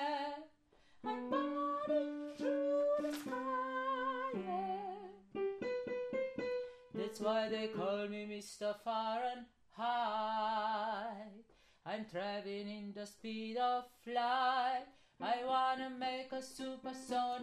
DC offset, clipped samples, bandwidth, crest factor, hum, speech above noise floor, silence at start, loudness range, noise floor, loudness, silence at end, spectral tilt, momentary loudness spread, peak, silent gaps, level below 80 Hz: under 0.1%; under 0.1%; 14.5 kHz; 18 dB; none; 29 dB; 0 s; 4 LU; -68 dBFS; -39 LUFS; 0 s; -4.5 dB/octave; 12 LU; -22 dBFS; none; -78 dBFS